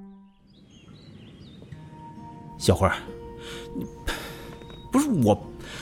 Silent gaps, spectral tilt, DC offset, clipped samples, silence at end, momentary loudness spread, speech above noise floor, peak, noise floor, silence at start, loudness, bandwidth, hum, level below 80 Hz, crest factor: none; -5.5 dB/octave; under 0.1%; under 0.1%; 0 s; 25 LU; 30 dB; -6 dBFS; -54 dBFS; 0 s; -26 LUFS; 16 kHz; none; -46 dBFS; 22 dB